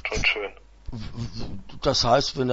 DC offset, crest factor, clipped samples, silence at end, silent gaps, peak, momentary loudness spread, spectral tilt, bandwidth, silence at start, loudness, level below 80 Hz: under 0.1%; 18 dB; under 0.1%; 0 s; none; -6 dBFS; 19 LU; -4 dB/octave; 8 kHz; 0.05 s; -24 LUFS; -38 dBFS